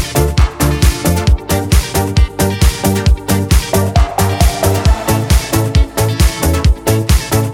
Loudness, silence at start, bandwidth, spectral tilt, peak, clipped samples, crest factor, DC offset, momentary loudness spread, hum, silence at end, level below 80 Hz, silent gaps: -13 LUFS; 0 s; 17 kHz; -5 dB/octave; 0 dBFS; under 0.1%; 12 dB; under 0.1%; 2 LU; none; 0 s; -16 dBFS; none